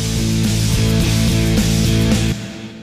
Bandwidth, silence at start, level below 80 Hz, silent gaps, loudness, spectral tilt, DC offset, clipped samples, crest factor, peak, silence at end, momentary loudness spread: 16 kHz; 0 s; -24 dBFS; none; -16 LUFS; -5 dB/octave; under 0.1%; under 0.1%; 12 dB; -4 dBFS; 0 s; 5 LU